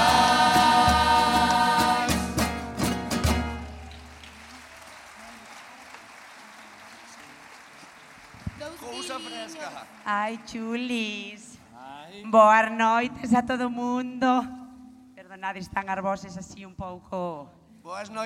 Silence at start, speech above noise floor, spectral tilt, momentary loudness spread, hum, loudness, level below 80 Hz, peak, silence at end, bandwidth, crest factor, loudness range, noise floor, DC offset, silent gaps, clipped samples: 0 s; 23 dB; -4 dB/octave; 26 LU; none; -24 LUFS; -46 dBFS; -6 dBFS; 0 s; 16.5 kHz; 20 dB; 21 LU; -49 dBFS; under 0.1%; none; under 0.1%